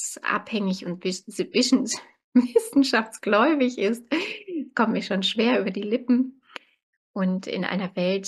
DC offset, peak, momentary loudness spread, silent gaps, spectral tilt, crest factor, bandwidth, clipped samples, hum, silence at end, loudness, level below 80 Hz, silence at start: under 0.1%; -6 dBFS; 10 LU; 2.24-2.32 s, 6.83-7.14 s; -4.5 dB/octave; 18 dB; 12.5 kHz; under 0.1%; none; 0 s; -24 LUFS; -74 dBFS; 0 s